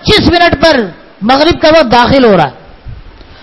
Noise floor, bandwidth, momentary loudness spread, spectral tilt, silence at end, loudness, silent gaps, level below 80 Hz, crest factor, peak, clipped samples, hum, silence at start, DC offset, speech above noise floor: -30 dBFS; 12 kHz; 9 LU; -5.5 dB/octave; 0.35 s; -7 LUFS; none; -28 dBFS; 8 dB; 0 dBFS; 1%; none; 0.05 s; under 0.1%; 24 dB